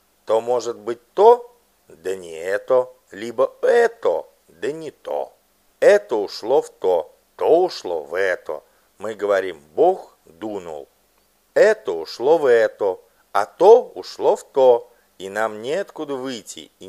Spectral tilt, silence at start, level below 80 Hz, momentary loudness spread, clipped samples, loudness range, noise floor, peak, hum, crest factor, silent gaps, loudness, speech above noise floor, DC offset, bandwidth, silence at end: -4 dB/octave; 0.3 s; -70 dBFS; 17 LU; under 0.1%; 5 LU; -61 dBFS; 0 dBFS; none; 20 dB; none; -20 LUFS; 42 dB; under 0.1%; 13 kHz; 0 s